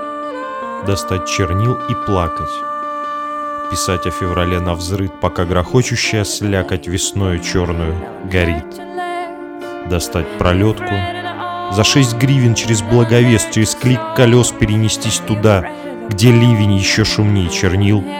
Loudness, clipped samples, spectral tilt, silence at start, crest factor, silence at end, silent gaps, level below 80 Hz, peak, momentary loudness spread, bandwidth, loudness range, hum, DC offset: -15 LUFS; under 0.1%; -5 dB/octave; 0 s; 14 dB; 0 s; none; -34 dBFS; 0 dBFS; 12 LU; 16.5 kHz; 6 LU; none; under 0.1%